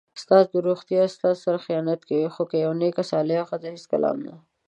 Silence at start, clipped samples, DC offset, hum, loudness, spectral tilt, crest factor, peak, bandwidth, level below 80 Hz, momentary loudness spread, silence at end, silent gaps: 0.15 s; under 0.1%; under 0.1%; none; -23 LUFS; -7 dB/octave; 20 dB; -4 dBFS; 9 kHz; -76 dBFS; 9 LU; 0.3 s; none